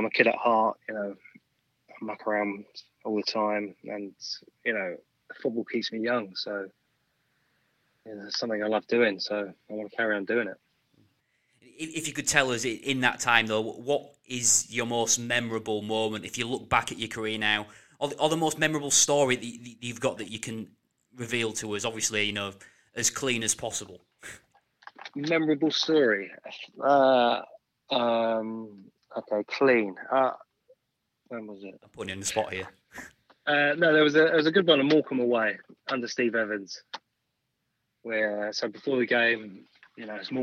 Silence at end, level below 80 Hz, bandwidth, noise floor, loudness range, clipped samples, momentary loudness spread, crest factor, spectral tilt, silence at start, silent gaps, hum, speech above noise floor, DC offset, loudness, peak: 0 s; -68 dBFS; 16 kHz; -80 dBFS; 8 LU; under 0.1%; 19 LU; 26 dB; -2.5 dB/octave; 0 s; none; none; 52 dB; under 0.1%; -27 LUFS; -2 dBFS